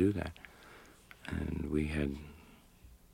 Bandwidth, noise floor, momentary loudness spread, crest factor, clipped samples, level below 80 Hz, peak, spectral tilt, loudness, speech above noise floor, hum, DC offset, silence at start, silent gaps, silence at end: 16.5 kHz; -59 dBFS; 22 LU; 20 dB; under 0.1%; -48 dBFS; -18 dBFS; -7.5 dB/octave; -37 LUFS; 25 dB; none; under 0.1%; 0 s; none; 0.15 s